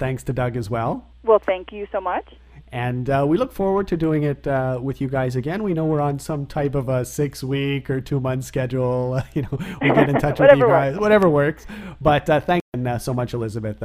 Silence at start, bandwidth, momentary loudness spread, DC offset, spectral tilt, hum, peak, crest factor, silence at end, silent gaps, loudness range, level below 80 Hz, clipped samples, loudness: 0 s; 15.5 kHz; 11 LU; under 0.1%; -7 dB/octave; none; 0 dBFS; 20 dB; 0 s; 12.61-12.72 s; 6 LU; -42 dBFS; under 0.1%; -21 LUFS